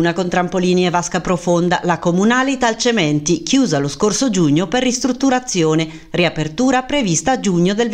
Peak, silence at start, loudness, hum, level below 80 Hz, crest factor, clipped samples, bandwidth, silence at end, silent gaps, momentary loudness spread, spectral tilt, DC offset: -2 dBFS; 0 s; -16 LUFS; none; -44 dBFS; 14 dB; under 0.1%; 11 kHz; 0 s; none; 3 LU; -4.5 dB/octave; under 0.1%